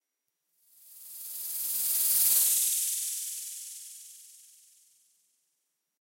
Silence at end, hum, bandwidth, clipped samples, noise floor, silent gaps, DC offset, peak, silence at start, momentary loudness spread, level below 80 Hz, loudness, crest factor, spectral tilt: 1.65 s; none; 16.5 kHz; under 0.1%; -83 dBFS; none; under 0.1%; -10 dBFS; 0.85 s; 23 LU; -76 dBFS; -26 LUFS; 22 dB; 4 dB/octave